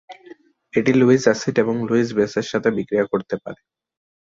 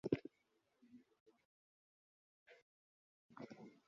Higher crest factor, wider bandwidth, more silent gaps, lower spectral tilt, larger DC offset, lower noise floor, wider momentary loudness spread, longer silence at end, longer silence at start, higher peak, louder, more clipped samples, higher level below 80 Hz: second, 18 dB vs 32 dB; about the same, 7.6 kHz vs 7.2 kHz; second, none vs 1.20-1.26 s, 1.45-2.46 s, 2.62-3.29 s; about the same, -6 dB/octave vs -7 dB/octave; neither; second, -46 dBFS vs -83 dBFS; second, 10 LU vs 24 LU; first, 0.75 s vs 0.15 s; about the same, 0.1 s vs 0.05 s; first, -2 dBFS vs -22 dBFS; first, -19 LUFS vs -50 LUFS; neither; first, -60 dBFS vs -80 dBFS